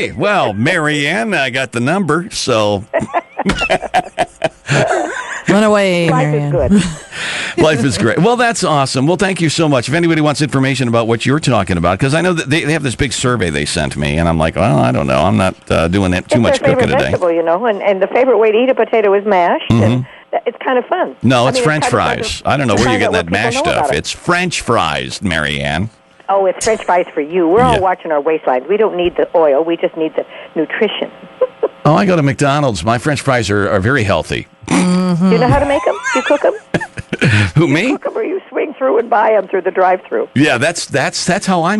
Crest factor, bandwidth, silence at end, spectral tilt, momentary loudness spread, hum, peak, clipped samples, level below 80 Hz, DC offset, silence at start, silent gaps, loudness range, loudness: 12 dB; 11.5 kHz; 0 s; -5.5 dB/octave; 7 LU; none; 0 dBFS; under 0.1%; -36 dBFS; under 0.1%; 0 s; none; 3 LU; -14 LUFS